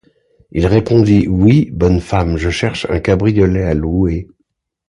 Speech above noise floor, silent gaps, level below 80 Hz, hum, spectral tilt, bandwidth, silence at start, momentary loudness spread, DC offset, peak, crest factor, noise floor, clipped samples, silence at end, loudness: 54 dB; none; -26 dBFS; none; -7.5 dB/octave; 10.5 kHz; 0.55 s; 7 LU; under 0.1%; 0 dBFS; 14 dB; -67 dBFS; under 0.1%; 0.65 s; -14 LUFS